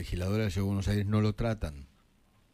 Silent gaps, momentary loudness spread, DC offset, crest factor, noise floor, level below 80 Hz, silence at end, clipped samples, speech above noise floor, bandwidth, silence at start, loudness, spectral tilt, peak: none; 10 LU; under 0.1%; 14 dB; -65 dBFS; -44 dBFS; 0.7 s; under 0.1%; 35 dB; 15 kHz; 0 s; -31 LUFS; -7 dB/octave; -18 dBFS